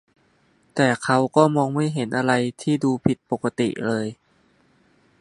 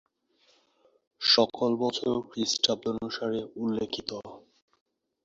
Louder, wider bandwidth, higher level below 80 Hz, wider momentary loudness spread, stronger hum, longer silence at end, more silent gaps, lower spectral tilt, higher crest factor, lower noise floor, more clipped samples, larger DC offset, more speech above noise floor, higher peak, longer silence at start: first, -22 LUFS vs -28 LUFS; first, 11.5 kHz vs 7.8 kHz; first, -58 dBFS vs -66 dBFS; second, 8 LU vs 12 LU; neither; first, 1.05 s vs 0.85 s; neither; first, -6 dB/octave vs -3.5 dB/octave; about the same, 22 dB vs 24 dB; second, -61 dBFS vs -67 dBFS; neither; neither; about the same, 40 dB vs 38 dB; first, -2 dBFS vs -6 dBFS; second, 0.75 s vs 1.2 s